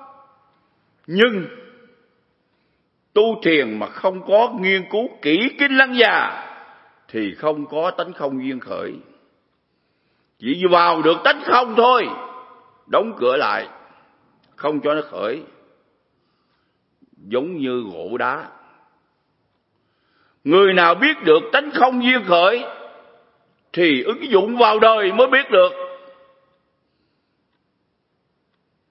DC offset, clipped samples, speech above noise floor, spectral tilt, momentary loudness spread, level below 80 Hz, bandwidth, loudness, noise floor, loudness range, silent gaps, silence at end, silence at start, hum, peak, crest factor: under 0.1%; under 0.1%; 52 dB; -7.5 dB/octave; 16 LU; -72 dBFS; 5.8 kHz; -17 LUFS; -69 dBFS; 11 LU; none; 2.95 s; 0 s; none; 0 dBFS; 20 dB